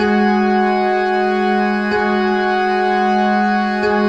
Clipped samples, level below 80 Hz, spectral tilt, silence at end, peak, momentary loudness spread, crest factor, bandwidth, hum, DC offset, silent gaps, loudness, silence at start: under 0.1%; -50 dBFS; -6.5 dB/octave; 0 s; -4 dBFS; 2 LU; 12 dB; 8 kHz; none; 0.3%; none; -15 LUFS; 0 s